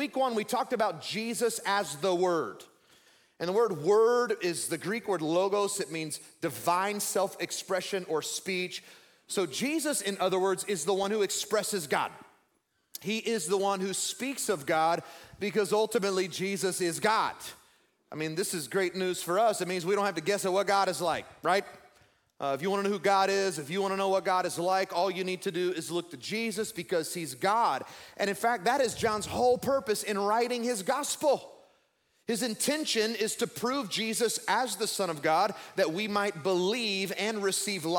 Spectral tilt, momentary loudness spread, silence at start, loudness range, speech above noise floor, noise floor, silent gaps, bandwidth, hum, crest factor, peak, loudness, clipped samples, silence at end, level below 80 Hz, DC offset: -3 dB/octave; 7 LU; 0 s; 3 LU; 45 dB; -74 dBFS; none; 18 kHz; none; 18 dB; -12 dBFS; -30 LUFS; under 0.1%; 0 s; -72 dBFS; under 0.1%